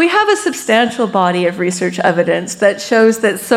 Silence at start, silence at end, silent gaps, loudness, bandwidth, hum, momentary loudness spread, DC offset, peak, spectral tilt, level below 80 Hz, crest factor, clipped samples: 0 s; 0 s; none; -14 LUFS; 16.5 kHz; none; 5 LU; under 0.1%; 0 dBFS; -4 dB/octave; -60 dBFS; 12 dB; under 0.1%